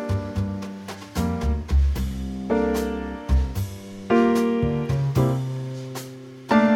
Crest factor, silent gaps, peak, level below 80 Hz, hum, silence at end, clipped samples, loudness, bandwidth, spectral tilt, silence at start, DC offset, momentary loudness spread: 18 dB; none; -6 dBFS; -30 dBFS; none; 0 s; under 0.1%; -24 LUFS; 16.5 kHz; -7.5 dB/octave; 0 s; under 0.1%; 14 LU